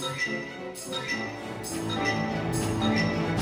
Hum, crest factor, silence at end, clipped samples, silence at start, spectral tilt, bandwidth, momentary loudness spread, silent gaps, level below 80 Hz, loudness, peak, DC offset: none; 16 dB; 0 s; under 0.1%; 0 s; -4.5 dB/octave; 16 kHz; 9 LU; none; -50 dBFS; -29 LUFS; -12 dBFS; under 0.1%